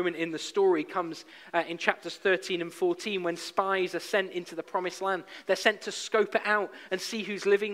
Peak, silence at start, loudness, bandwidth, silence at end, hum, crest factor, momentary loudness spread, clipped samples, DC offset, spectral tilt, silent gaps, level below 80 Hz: -6 dBFS; 0 s; -29 LUFS; 15.5 kHz; 0 s; none; 24 dB; 8 LU; under 0.1%; under 0.1%; -3.5 dB/octave; none; -82 dBFS